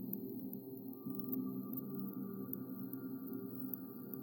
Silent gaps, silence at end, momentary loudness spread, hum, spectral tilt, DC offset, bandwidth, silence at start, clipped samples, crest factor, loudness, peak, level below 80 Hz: none; 0 s; 6 LU; none; -11.5 dB/octave; under 0.1%; 17.5 kHz; 0 s; under 0.1%; 20 dB; -45 LUFS; -24 dBFS; under -90 dBFS